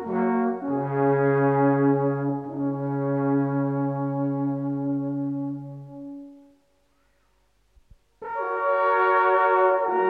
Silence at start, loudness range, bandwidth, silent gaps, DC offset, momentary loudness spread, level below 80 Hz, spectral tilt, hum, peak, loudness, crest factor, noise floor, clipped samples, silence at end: 0 s; 11 LU; 4.7 kHz; none; under 0.1%; 15 LU; -68 dBFS; -10.5 dB/octave; none; -10 dBFS; -24 LUFS; 16 dB; -66 dBFS; under 0.1%; 0 s